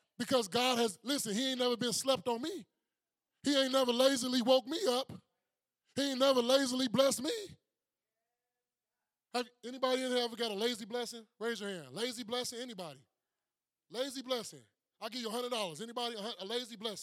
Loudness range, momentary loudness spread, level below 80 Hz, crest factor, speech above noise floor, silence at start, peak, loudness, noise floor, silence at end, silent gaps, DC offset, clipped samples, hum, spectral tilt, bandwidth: 9 LU; 14 LU; -82 dBFS; 22 dB; over 56 dB; 0.2 s; -14 dBFS; -34 LUFS; under -90 dBFS; 0 s; none; under 0.1%; under 0.1%; none; -3 dB/octave; 16 kHz